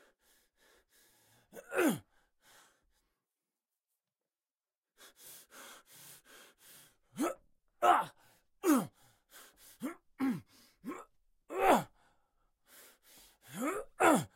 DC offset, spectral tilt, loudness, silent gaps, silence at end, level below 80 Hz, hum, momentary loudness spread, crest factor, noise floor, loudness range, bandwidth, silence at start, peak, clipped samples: under 0.1%; -4.5 dB/octave; -33 LUFS; 4.78-4.82 s; 0.1 s; -70 dBFS; none; 27 LU; 24 dB; under -90 dBFS; 21 LU; 16.5 kHz; 1.55 s; -14 dBFS; under 0.1%